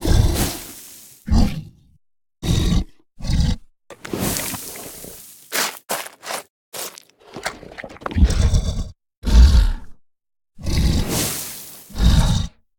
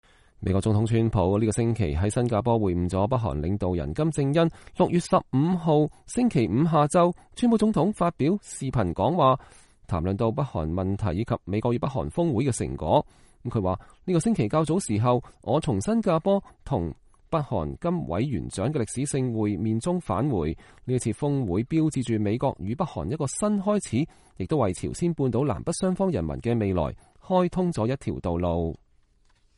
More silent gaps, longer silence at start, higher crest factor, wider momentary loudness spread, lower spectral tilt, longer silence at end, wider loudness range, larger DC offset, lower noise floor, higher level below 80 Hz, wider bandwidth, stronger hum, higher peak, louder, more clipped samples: first, 6.50-6.72 s, 9.17-9.22 s vs none; second, 0 s vs 0.4 s; about the same, 20 dB vs 18 dB; first, 18 LU vs 7 LU; second, -4.5 dB/octave vs -7 dB/octave; second, 0.3 s vs 0.8 s; about the same, 6 LU vs 4 LU; neither; second, -42 dBFS vs -62 dBFS; first, -22 dBFS vs -44 dBFS; first, 18 kHz vs 11.5 kHz; neither; first, 0 dBFS vs -8 dBFS; first, -21 LUFS vs -26 LUFS; neither